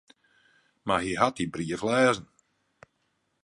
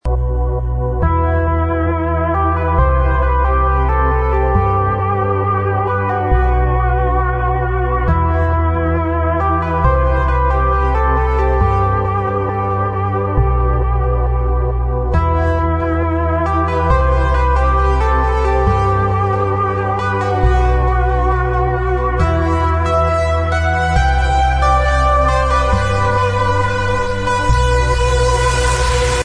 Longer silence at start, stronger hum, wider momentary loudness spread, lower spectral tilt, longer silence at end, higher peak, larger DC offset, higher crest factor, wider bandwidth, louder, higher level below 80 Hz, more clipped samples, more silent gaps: first, 0.85 s vs 0.05 s; neither; first, 10 LU vs 3 LU; second, -4.5 dB/octave vs -6.5 dB/octave; first, 1.2 s vs 0 s; second, -6 dBFS vs 0 dBFS; neither; first, 24 dB vs 14 dB; about the same, 11.5 kHz vs 10.5 kHz; second, -27 LUFS vs -15 LUFS; second, -60 dBFS vs -18 dBFS; neither; neither